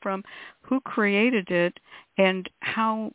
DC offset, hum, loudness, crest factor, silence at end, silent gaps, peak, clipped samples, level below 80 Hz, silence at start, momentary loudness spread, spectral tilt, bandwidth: under 0.1%; none; -25 LUFS; 18 dB; 0.05 s; none; -8 dBFS; under 0.1%; -70 dBFS; 0 s; 12 LU; -9.5 dB/octave; 4 kHz